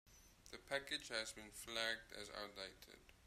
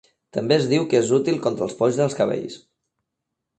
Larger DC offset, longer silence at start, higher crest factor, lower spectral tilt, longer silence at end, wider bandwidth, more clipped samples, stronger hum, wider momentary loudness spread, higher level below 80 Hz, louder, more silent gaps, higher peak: neither; second, 0.05 s vs 0.35 s; first, 24 dB vs 18 dB; second, -1.5 dB/octave vs -5.5 dB/octave; second, 0 s vs 1 s; first, 15.5 kHz vs 9 kHz; neither; neither; first, 19 LU vs 11 LU; second, -72 dBFS vs -64 dBFS; second, -46 LUFS vs -21 LUFS; neither; second, -26 dBFS vs -4 dBFS